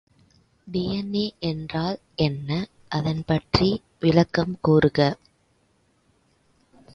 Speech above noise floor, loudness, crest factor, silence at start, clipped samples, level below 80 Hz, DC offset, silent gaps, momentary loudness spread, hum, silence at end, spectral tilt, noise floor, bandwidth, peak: 42 dB; -24 LUFS; 22 dB; 0.65 s; under 0.1%; -46 dBFS; under 0.1%; none; 10 LU; none; 1.8 s; -7.5 dB/octave; -65 dBFS; 7.2 kHz; -2 dBFS